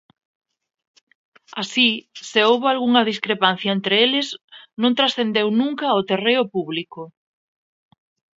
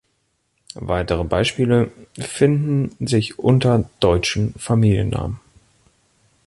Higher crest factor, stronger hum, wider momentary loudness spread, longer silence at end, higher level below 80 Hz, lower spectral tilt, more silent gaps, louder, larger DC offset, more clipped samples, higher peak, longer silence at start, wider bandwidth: about the same, 22 dB vs 18 dB; neither; about the same, 14 LU vs 13 LU; first, 1.3 s vs 1.1 s; second, -72 dBFS vs -38 dBFS; second, -4.5 dB/octave vs -6.5 dB/octave; first, 4.44-4.48 s vs none; about the same, -19 LUFS vs -19 LUFS; neither; neither; about the same, 0 dBFS vs -2 dBFS; first, 1.55 s vs 0.75 s; second, 7.8 kHz vs 11.5 kHz